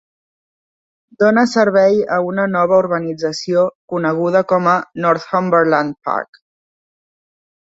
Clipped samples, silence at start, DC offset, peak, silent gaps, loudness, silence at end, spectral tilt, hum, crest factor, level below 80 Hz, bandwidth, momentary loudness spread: under 0.1%; 1.2 s; under 0.1%; -2 dBFS; 3.75-3.88 s; -15 LUFS; 1.5 s; -6 dB/octave; none; 16 dB; -60 dBFS; 8 kHz; 8 LU